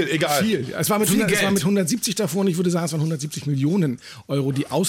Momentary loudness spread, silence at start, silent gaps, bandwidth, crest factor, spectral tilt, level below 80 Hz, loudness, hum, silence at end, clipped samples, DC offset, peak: 7 LU; 0 s; none; 17 kHz; 12 dB; -4.5 dB/octave; -60 dBFS; -21 LUFS; none; 0 s; under 0.1%; under 0.1%; -8 dBFS